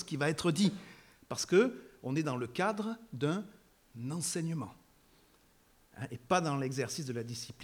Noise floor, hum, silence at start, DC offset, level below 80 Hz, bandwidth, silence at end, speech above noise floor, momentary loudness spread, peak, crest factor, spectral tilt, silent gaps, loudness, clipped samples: -66 dBFS; none; 0 s; under 0.1%; -70 dBFS; 19 kHz; 0 s; 33 dB; 15 LU; -16 dBFS; 20 dB; -5 dB/octave; none; -34 LUFS; under 0.1%